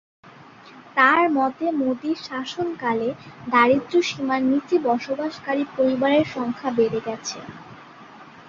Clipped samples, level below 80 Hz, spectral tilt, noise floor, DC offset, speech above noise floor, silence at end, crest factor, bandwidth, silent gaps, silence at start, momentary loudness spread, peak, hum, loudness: under 0.1%; -62 dBFS; -4.5 dB/octave; -46 dBFS; under 0.1%; 24 dB; 0 s; 20 dB; 7.6 kHz; none; 0.25 s; 12 LU; -2 dBFS; none; -22 LUFS